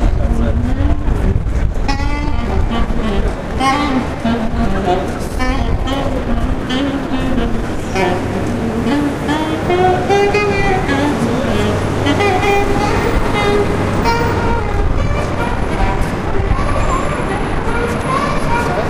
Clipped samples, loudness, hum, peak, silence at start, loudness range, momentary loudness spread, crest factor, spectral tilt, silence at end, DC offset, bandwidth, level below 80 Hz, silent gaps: under 0.1%; -16 LUFS; none; 0 dBFS; 0 s; 4 LU; 5 LU; 14 dB; -6 dB/octave; 0 s; under 0.1%; 15.5 kHz; -20 dBFS; none